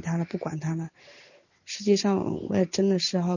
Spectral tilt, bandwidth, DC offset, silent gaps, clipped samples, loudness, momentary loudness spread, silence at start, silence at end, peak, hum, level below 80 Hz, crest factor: -5.5 dB/octave; 7.4 kHz; under 0.1%; none; under 0.1%; -26 LUFS; 10 LU; 0 s; 0 s; -10 dBFS; none; -62 dBFS; 16 dB